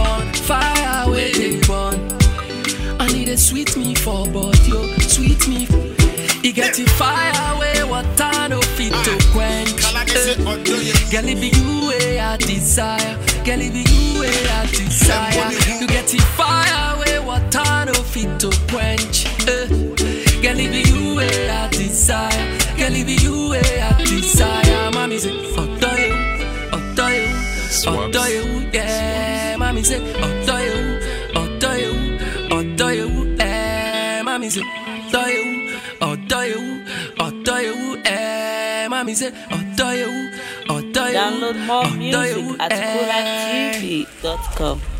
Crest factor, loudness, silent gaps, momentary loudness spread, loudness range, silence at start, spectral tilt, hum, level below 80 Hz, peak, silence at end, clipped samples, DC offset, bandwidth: 18 dB; -17 LUFS; none; 8 LU; 5 LU; 0 s; -3.5 dB/octave; none; -24 dBFS; 0 dBFS; 0 s; under 0.1%; under 0.1%; 16.5 kHz